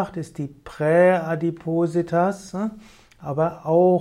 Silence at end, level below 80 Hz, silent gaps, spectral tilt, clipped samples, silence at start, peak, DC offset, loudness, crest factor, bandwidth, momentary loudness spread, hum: 0 s; -58 dBFS; none; -8 dB/octave; under 0.1%; 0 s; -6 dBFS; under 0.1%; -22 LUFS; 16 dB; 11.5 kHz; 15 LU; none